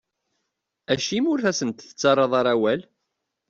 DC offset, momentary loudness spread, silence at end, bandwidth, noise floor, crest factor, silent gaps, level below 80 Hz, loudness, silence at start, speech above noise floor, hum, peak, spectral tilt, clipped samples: under 0.1%; 8 LU; 0.7 s; 7.8 kHz; -79 dBFS; 18 dB; none; -64 dBFS; -22 LUFS; 0.9 s; 58 dB; none; -6 dBFS; -4 dB/octave; under 0.1%